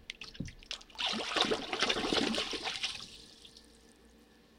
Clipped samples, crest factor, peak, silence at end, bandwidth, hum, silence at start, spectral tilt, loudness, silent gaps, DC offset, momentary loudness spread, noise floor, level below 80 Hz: under 0.1%; 24 dB; -12 dBFS; 0.5 s; 16.5 kHz; none; 0 s; -2.5 dB/octave; -33 LUFS; none; under 0.1%; 19 LU; -61 dBFS; -60 dBFS